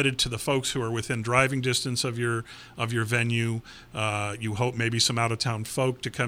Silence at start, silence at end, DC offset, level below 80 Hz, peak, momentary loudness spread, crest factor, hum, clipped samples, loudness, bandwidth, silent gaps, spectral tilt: 0 s; 0 s; under 0.1%; -54 dBFS; -6 dBFS; 8 LU; 22 dB; none; under 0.1%; -26 LUFS; 16 kHz; none; -4 dB/octave